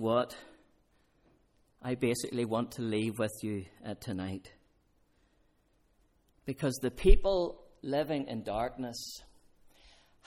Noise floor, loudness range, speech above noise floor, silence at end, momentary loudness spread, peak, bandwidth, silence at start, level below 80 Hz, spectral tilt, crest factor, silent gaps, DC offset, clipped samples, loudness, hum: -70 dBFS; 8 LU; 40 dB; 1.05 s; 15 LU; -8 dBFS; 15.5 kHz; 0 s; -38 dBFS; -5.5 dB/octave; 26 dB; none; under 0.1%; under 0.1%; -34 LUFS; none